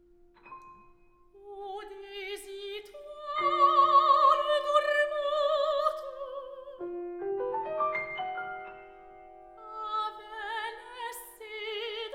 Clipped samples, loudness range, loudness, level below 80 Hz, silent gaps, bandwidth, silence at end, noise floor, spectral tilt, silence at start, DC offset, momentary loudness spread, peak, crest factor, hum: under 0.1%; 13 LU; -29 LUFS; -66 dBFS; none; 16.5 kHz; 0 s; -59 dBFS; -2.5 dB/octave; 0.45 s; under 0.1%; 22 LU; -10 dBFS; 20 dB; none